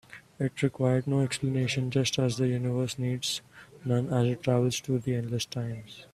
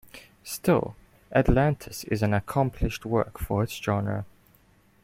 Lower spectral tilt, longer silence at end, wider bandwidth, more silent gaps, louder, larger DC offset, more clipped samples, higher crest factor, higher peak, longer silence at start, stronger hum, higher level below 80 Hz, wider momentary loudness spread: about the same, -5.5 dB/octave vs -6.5 dB/octave; second, 0.1 s vs 0.75 s; second, 13.5 kHz vs 16.5 kHz; neither; about the same, -29 LUFS vs -27 LUFS; neither; neither; about the same, 18 dB vs 20 dB; about the same, -10 dBFS vs -8 dBFS; about the same, 0.1 s vs 0.15 s; neither; second, -60 dBFS vs -38 dBFS; second, 7 LU vs 12 LU